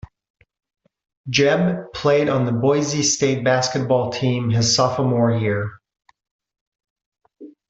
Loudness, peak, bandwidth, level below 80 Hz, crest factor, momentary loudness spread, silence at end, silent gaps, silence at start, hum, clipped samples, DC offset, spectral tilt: -19 LUFS; -4 dBFS; 8.2 kHz; -56 dBFS; 18 dB; 6 LU; 0.2 s; 6.31-6.39 s, 6.61-6.72 s, 6.90-6.96 s, 7.06-7.12 s; 1.25 s; none; under 0.1%; under 0.1%; -4.5 dB/octave